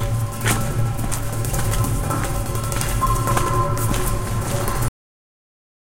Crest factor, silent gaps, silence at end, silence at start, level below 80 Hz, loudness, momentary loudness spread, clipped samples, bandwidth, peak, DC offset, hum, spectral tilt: 20 dB; none; 1.05 s; 0 s; -28 dBFS; -22 LUFS; 4 LU; under 0.1%; 17 kHz; -2 dBFS; under 0.1%; none; -5 dB/octave